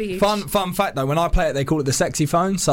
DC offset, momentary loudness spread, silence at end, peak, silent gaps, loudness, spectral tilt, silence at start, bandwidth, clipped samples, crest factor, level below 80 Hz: under 0.1%; 2 LU; 0 s; -8 dBFS; none; -20 LUFS; -4.5 dB/octave; 0 s; 17 kHz; under 0.1%; 12 dB; -30 dBFS